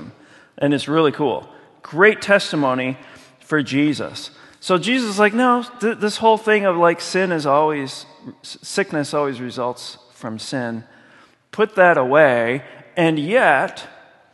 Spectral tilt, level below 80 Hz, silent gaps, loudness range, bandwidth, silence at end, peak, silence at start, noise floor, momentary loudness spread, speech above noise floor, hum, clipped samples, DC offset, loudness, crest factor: -5 dB/octave; -66 dBFS; none; 7 LU; 12 kHz; 0.45 s; 0 dBFS; 0 s; -51 dBFS; 19 LU; 33 dB; none; under 0.1%; under 0.1%; -18 LUFS; 20 dB